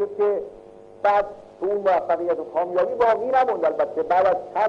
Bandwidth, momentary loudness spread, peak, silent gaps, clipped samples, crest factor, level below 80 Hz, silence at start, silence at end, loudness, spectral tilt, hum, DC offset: 7.6 kHz; 7 LU; -8 dBFS; none; under 0.1%; 14 dB; -60 dBFS; 0 s; 0 s; -22 LUFS; -6 dB/octave; 50 Hz at -65 dBFS; under 0.1%